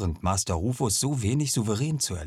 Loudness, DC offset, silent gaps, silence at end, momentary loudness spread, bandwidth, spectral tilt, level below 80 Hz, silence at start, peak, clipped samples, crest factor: -26 LUFS; under 0.1%; none; 0 s; 2 LU; 15.5 kHz; -4.5 dB/octave; -44 dBFS; 0 s; -12 dBFS; under 0.1%; 16 dB